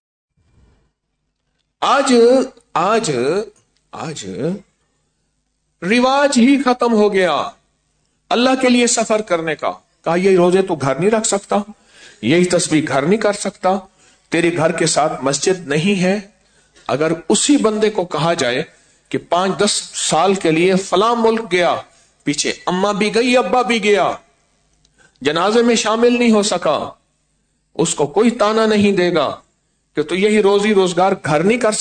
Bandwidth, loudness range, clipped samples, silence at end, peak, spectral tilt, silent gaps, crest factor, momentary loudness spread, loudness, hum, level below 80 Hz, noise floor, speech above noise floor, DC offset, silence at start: 9.4 kHz; 2 LU; under 0.1%; 0 s; -2 dBFS; -4 dB/octave; none; 14 dB; 11 LU; -16 LUFS; none; -54 dBFS; -71 dBFS; 56 dB; under 0.1%; 1.8 s